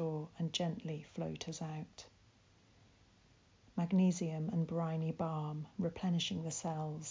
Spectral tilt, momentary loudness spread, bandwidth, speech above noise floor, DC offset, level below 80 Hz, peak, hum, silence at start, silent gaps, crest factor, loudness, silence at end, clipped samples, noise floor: -6 dB/octave; 11 LU; 7.6 kHz; 30 dB; under 0.1%; -70 dBFS; -22 dBFS; none; 0 s; none; 16 dB; -39 LUFS; 0 s; under 0.1%; -67 dBFS